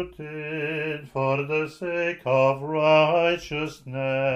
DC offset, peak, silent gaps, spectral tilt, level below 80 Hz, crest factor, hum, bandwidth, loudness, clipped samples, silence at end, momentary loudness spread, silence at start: under 0.1%; -6 dBFS; none; -6.5 dB/octave; -58 dBFS; 18 dB; none; 12.5 kHz; -24 LUFS; under 0.1%; 0 s; 12 LU; 0 s